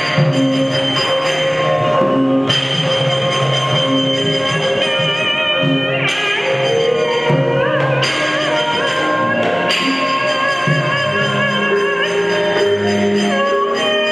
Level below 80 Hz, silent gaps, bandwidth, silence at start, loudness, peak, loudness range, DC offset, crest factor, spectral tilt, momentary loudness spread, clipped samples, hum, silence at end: -52 dBFS; none; 12 kHz; 0 s; -15 LUFS; -2 dBFS; 0 LU; under 0.1%; 14 dB; -4.5 dB/octave; 1 LU; under 0.1%; none; 0 s